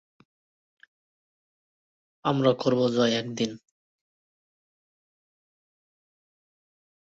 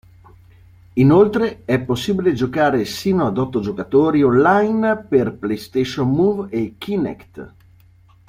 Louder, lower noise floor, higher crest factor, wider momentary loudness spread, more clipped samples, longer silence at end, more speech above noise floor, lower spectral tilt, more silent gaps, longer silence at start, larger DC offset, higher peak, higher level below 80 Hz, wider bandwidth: second, -25 LUFS vs -18 LUFS; first, under -90 dBFS vs -50 dBFS; first, 24 dB vs 16 dB; second, 8 LU vs 11 LU; neither; first, 3.6 s vs 0.8 s; first, over 66 dB vs 33 dB; second, -5.5 dB/octave vs -7 dB/octave; neither; first, 2.25 s vs 0.95 s; neither; second, -6 dBFS vs -2 dBFS; second, -70 dBFS vs -50 dBFS; second, 8 kHz vs 15.5 kHz